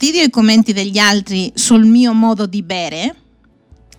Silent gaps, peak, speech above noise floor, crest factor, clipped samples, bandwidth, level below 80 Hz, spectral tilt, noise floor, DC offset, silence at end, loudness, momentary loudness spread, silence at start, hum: none; 0 dBFS; 36 dB; 14 dB; under 0.1%; 14 kHz; -50 dBFS; -3.5 dB/octave; -48 dBFS; under 0.1%; 0.85 s; -12 LUFS; 11 LU; 0 s; none